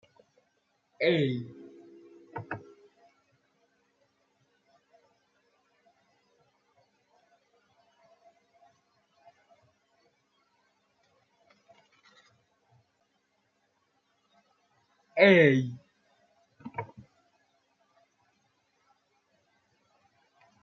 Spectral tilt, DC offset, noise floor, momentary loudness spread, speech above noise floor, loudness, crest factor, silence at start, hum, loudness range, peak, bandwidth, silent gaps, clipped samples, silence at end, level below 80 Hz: -4.5 dB/octave; under 0.1%; -75 dBFS; 29 LU; 52 dB; -26 LUFS; 30 dB; 1 s; none; 22 LU; -6 dBFS; 7.2 kHz; none; under 0.1%; 3.75 s; -80 dBFS